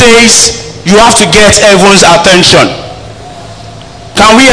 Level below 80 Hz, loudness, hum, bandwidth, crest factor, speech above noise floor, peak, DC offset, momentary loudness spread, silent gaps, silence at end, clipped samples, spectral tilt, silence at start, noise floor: -28 dBFS; -2 LUFS; none; 11 kHz; 4 dB; 23 dB; 0 dBFS; under 0.1%; 12 LU; none; 0 s; 20%; -2.5 dB/octave; 0 s; -26 dBFS